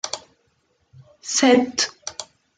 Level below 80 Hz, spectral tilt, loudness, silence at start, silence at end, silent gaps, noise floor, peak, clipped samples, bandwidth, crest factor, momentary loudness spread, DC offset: -68 dBFS; -2 dB/octave; -19 LUFS; 0.05 s; 0.35 s; none; -67 dBFS; -4 dBFS; under 0.1%; 9.6 kHz; 20 dB; 19 LU; under 0.1%